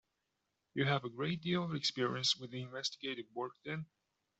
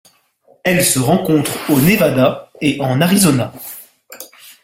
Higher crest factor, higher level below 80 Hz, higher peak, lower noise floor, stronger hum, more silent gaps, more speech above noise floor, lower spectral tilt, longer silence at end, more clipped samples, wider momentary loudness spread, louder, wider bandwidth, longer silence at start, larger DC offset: about the same, 20 dB vs 16 dB; second, -76 dBFS vs -48 dBFS; second, -18 dBFS vs 0 dBFS; first, -86 dBFS vs -53 dBFS; neither; neither; first, 47 dB vs 40 dB; about the same, -4.5 dB/octave vs -4.5 dB/octave; first, 0.55 s vs 0.15 s; neither; second, 10 LU vs 22 LU; second, -37 LUFS vs -14 LUFS; second, 8.2 kHz vs 16.5 kHz; about the same, 0.75 s vs 0.65 s; neither